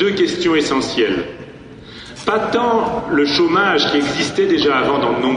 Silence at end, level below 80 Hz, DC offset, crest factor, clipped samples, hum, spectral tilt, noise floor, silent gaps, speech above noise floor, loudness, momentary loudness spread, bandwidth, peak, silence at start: 0 s; -48 dBFS; under 0.1%; 14 dB; under 0.1%; none; -4.5 dB/octave; -36 dBFS; none; 21 dB; -16 LUFS; 17 LU; 10 kHz; -4 dBFS; 0 s